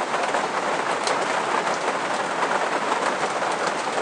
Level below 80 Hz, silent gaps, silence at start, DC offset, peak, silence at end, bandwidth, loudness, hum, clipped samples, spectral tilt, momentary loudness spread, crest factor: -76 dBFS; none; 0 s; under 0.1%; -6 dBFS; 0 s; 10.5 kHz; -23 LUFS; none; under 0.1%; -2.5 dB/octave; 2 LU; 18 dB